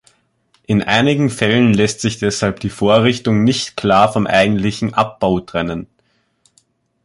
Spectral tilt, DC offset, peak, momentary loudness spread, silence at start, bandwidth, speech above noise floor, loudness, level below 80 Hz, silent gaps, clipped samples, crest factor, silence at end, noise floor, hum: -5.5 dB/octave; under 0.1%; 0 dBFS; 6 LU; 0.7 s; 11.5 kHz; 47 dB; -15 LUFS; -44 dBFS; none; under 0.1%; 16 dB; 1.2 s; -62 dBFS; none